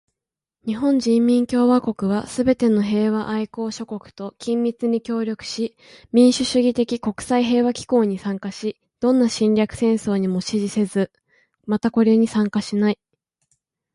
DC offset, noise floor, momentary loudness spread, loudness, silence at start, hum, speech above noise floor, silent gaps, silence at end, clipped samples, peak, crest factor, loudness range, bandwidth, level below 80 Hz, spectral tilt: under 0.1%; -86 dBFS; 11 LU; -20 LUFS; 0.65 s; none; 67 dB; none; 1 s; under 0.1%; -4 dBFS; 16 dB; 3 LU; 11.5 kHz; -56 dBFS; -6 dB/octave